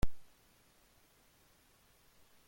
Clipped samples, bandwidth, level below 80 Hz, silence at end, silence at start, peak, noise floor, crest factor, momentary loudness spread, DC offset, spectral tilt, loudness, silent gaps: under 0.1%; 16.5 kHz; -50 dBFS; 0 s; 0 s; -18 dBFS; -68 dBFS; 20 dB; 0 LU; under 0.1%; -6 dB/octave; -58 LUFS; none